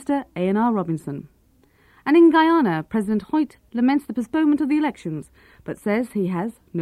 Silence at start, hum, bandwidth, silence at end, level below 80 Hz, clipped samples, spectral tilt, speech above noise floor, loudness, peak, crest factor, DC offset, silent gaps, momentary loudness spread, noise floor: 0 s; none; 12.5 kHz; 0 s; -58 dBFS; under 0.1%; -7.5 dB/octave; 37 dB; -21 LUFS; -6 dBFS; 14 dB; under 0.1%; none; 17 LU; -58 dBFS